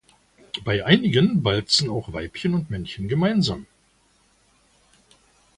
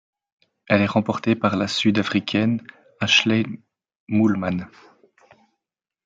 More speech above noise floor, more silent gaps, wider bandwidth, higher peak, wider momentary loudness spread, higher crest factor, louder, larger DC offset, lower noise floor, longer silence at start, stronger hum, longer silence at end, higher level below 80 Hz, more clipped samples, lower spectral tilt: second, 40 dB vs 65 dB; second, none vs 3.96-4.07 s; first, 11.5 kHz vs 7.8 kHz; about the same, -2 dBFS vs -2 dBFS; about the same, 13 LU vs 12 LU; about the same, 22 dB vs 20 dB; about the same, -22 LUFS vs -21 LUFS; neither; second, -62 dBFS vs -86 dBFS; second, 0.55 s vs 0.7 s; neither; first, 1.95 s vs 1.4 s; first, -48 dBFS vs -64 dBFS; neither; about the same, -5.5 dB/octave vs -5 dB/octave